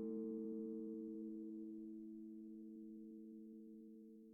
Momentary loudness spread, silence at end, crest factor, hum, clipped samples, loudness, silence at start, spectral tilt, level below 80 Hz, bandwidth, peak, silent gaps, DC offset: 12 LU; 0 s; 14 dB; none; under 0.1%; -52 LUFS; 0 s; -12.5 dB/octave; -88 dBFS; 1.4 kHz; -38 dBFS; none; under 0.1%